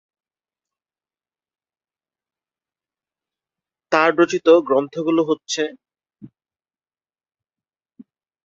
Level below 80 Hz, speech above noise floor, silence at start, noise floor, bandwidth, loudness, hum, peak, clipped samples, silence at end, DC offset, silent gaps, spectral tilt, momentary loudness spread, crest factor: -72 dBFS; over 73 dB; 3.9 s; under -90 dBFS; 7.8 kHz; -18 LUFS; none; 0 dBFS; under 0.1%; 2.2 s; under 0.1%; none; -4 dB/octave; 10 LU; 24 dB